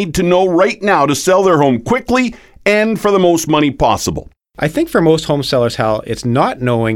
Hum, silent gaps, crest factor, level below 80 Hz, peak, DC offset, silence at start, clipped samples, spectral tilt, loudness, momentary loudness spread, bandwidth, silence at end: none; none; 14 dB; -38 dBFS; 0 dBFS; under 0.1%; 0 s; under 0.1%; -5 dB/octave; -13 LUFS; 7 LU; 17 kHz; 0 s